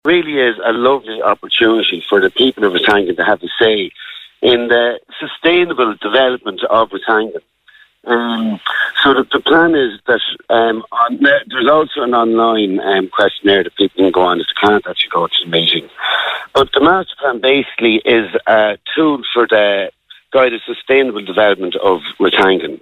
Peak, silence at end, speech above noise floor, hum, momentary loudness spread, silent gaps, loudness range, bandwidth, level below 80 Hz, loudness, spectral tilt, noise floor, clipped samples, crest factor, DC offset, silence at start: 0 dBFS; 0.05 s; 35 dB; none; 5 LU; none; 2 LU; 9.6 kHz; -52 dBFS; -13 LUFS; -5.5 dB/octave; -48 dBFS; under 0.1%; 12 dB; under 0.1%; 0.05 s